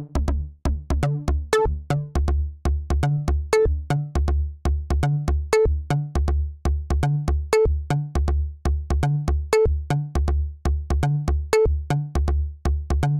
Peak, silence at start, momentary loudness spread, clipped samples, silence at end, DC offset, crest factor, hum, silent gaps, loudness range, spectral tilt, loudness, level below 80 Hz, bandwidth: -6 dBFS; 0 s; 6 LU; under 0.1%; 0 s; 0.2%; 16 dB; none; none; 1 LU; -7 dB/octave; -23 LUFS; -24 dBFS; 12 kHz